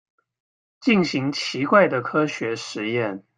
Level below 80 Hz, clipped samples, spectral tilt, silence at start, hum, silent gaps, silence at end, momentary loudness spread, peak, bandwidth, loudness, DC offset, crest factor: -66 dBFS; under 0.1%; -5.5 dB/octave; 0.8 s; none; none; 0.15 s; 10 LU; -2 dBFS; 9.6 kHz; -22 LUFS; under 0.1%; 20 dB